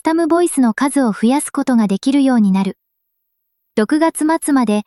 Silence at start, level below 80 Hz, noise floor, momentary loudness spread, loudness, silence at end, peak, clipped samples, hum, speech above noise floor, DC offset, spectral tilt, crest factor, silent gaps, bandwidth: 0.05 s; -62 dBFS; -72 dBFS; 4 LU; -15 LUFS; 0.05 s; -4 dBFS; under 0.1%; none; 57 dB; under 0.1%; -5.5 dB/octave; 12 dB; none; 12.5 kHz